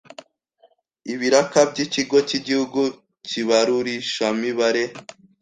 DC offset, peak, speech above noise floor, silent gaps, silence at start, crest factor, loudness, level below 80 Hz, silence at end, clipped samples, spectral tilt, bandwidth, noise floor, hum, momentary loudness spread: under 0.1%; -2 dBFS; 39 dB; none; 1.05 s; 20 dB; -21 LUFS; -66 dBFS; 0.3 s; under 0.1%; -3.5 dB/octave; 9.6 kHz; -59 dBFS; none; 11 LU